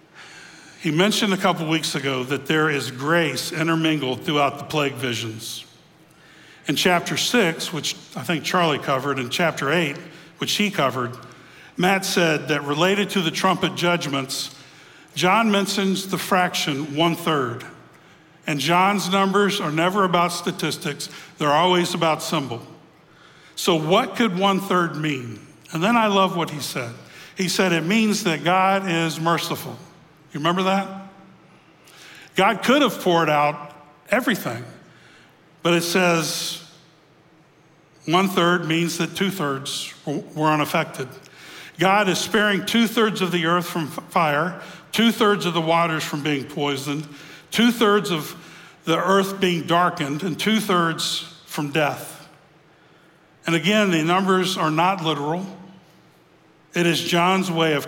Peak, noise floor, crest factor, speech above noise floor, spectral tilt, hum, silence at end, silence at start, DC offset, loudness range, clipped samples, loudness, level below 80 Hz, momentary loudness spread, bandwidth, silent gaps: -2 dBFS; -54 dBFS; 20 dB; 33 dB; -4.5 dB/octave; none; 0 s; 0.15 s; under 0.1%; 3 LU; under 0.1%; -21 LUFS; -66 dBFS; 14 LU; 17 kHz; none